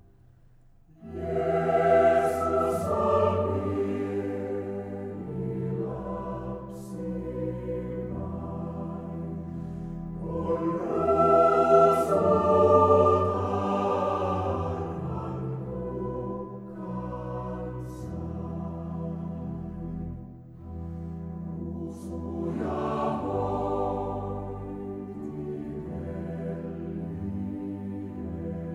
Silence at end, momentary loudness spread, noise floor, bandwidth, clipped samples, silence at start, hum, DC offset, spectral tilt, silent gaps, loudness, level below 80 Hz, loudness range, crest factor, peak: 0 s; 16 LU; -55 dBFS; 14 kHz; under 0.1%; 1 s; none; under 0.1%; -8.5 dB/octave; none; -28 LUFS; -48 dBFS; 14 LU; 22 dB; -6 dBFS